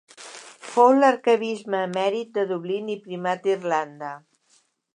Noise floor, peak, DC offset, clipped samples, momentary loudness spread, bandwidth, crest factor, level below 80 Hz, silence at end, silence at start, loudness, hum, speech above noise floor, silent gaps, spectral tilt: -64 dBFS; -4 dBFS; under 0.1%; under 0.1%; 22 LU; 11 kHz; 20 dB; -82 dBFS; 0.8 s; 0.2 s; -23 LUFS; none; 42 dB; none; -5 dB/octave